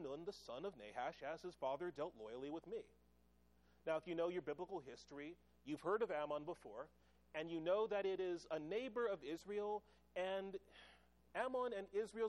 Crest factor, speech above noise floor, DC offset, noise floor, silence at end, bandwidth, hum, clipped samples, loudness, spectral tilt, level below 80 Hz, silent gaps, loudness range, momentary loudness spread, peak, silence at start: 18 dB; 29 dB; under 0.1%; -75 dBFS; 0 s; 12.5 kHz; none; under 0.1%; -46 LUFS; -5.5 dB/octave; -78 dBFS; none; 5 LU; 13 LU; -28 dBFS; 0 s